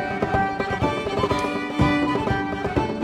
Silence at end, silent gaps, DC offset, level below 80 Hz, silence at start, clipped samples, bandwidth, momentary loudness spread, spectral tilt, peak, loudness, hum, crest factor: 0 s; none; under 0.1%; -38 dBFS; 0 s; under 0.1%; 12.5 kHz; 4 LU; -6.5 dB/octave; -6 dBFS; -23 LUFS; none; 18 dB